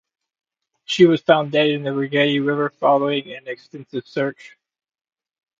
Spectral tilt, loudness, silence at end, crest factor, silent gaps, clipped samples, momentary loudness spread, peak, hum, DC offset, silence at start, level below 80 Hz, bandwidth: -6 dB/octave; -19 LUFS; 1.1 s; 20 dB; none; under 0.1%; 16 LU; 0 dBFS; none; under 0.1%; 0.9 s; -68 dBFS; 7.6 kHz